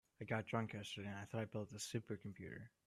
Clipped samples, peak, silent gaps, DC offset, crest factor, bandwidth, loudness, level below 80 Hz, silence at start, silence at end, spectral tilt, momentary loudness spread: under 0.1%; -26 dBFS; none; under 0.1%; 22 dB; 14.5 kHz; -47 LUFS; -78 dBFS; 0.2 s; 0.2 s; -5 dB/octave; 9 LU